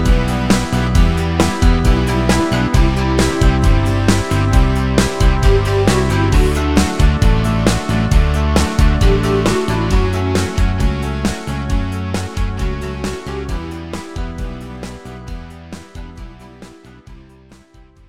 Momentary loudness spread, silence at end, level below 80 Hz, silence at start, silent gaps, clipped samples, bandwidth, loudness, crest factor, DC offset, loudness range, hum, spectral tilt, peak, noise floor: 15 LU; 0.75 s; -18 dBFS; 0 s; none; under 0.1%; 15 kHz; -16 LUFS; 14 dB; 0.8%; 14 LU; none; -6 dB/octave; 0 dBFS; -45 dBFS